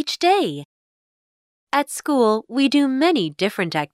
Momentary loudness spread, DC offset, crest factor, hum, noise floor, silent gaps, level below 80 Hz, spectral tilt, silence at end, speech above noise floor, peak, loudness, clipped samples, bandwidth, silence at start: 6 LU; under 0.1%; 16 dB; none; under -90 dBFS; 0.65-1.67 s; -72 dBFS; -4.5 dB/octave; 0.05 s; over 71 dB; -4 dBFS; -20 LUFS; under 0.1%; 14 kHz; 0 s